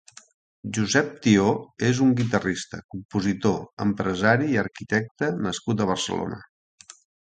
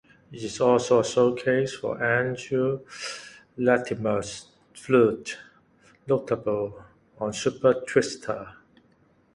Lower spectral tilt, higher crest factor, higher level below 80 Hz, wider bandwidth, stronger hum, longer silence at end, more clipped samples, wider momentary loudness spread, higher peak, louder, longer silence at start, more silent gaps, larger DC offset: about the same, -5.5 dB/octave vs -5 dB/octave; about the same, 20 dB vs 20 dB; first, -54 dBFS vs -62 dBFS; second, 9.4 kHz vs 11.5 kHz; neither; about the same, 0.85 s vs 0.85 s; neither; second, 11 LU vs 17 LU; about the same, -4 dBFS vs -6 dBFS; about the same, -24 LUFS vs -25 LUFS; first, 0.65 s vs 0.3 s; first, 2.84-2.89 s, 3.05-3.09 s, 3.73-3.77 s, 5.11-5.15 s vs none; neither